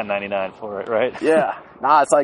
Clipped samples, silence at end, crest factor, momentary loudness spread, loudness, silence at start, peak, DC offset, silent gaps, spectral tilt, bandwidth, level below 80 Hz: under 0.1%; 0 s; 18 dB; 10 LU; -20 LUFS; 0 s; 0 dBFS; under 0.1%; none; -4 dB/octave; 11 kHz; -62 dBFS